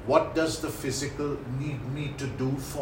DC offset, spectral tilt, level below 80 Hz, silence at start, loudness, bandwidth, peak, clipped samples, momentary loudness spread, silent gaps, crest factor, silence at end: under 0.1%; -5.5 dB/octave; -48 dBFS; 0 s; -30 LUFS; 16.5 kHz; -6 dBFS; under 0.1%; 8 LU; none; 22 dB; 0 s